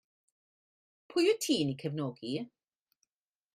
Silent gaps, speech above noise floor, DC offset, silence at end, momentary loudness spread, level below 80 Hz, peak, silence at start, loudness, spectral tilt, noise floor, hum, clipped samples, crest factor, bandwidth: none; 50 dB; under 0.1%; 1.1 s; 11 LU; -78 dBFS; -16 dBFS; 1.1 s; -32 LUFS; -4.5 dB/octave; -82 dBFS; none; under 0.1%; 18 dB; 15 kHz